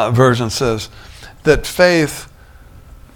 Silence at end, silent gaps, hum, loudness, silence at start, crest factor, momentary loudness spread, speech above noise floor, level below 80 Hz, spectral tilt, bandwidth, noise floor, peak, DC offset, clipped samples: 0.35 s; none; none; -15 LUFS; 0 s; 16 dB; 18 LU; 26 dB; -34 dBFS; -5 dB/octave; 18.5 kHz; -40 dBFS; 0 dBFS; under 0.1%; under 0.1%